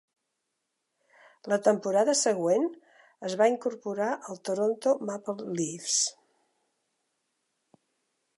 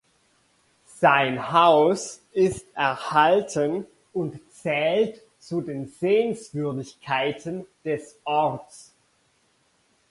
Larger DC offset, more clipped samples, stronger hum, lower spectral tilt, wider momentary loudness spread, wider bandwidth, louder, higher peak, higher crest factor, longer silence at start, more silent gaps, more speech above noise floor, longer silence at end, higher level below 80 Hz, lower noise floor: neither; neither; neither; second, -3 dB/octave vs -5 dB/octave; second, 10 LU vs 14 LU; about the same, 11.5 kHz vs 11.5 kHz; second, -28 LUFS vs -24 LUFS; second, -10 dBFS vs -4 dBFS; about the same, 20 dB vs 22 dB; first, 1.45 s vs 1 s; neither; first, 54 dB vs 42 dB; first, 2.25 s vs 1.3 s; second, -84 dBFS vs -62 dBFS; first, -82 dBFS vs -66 dBFS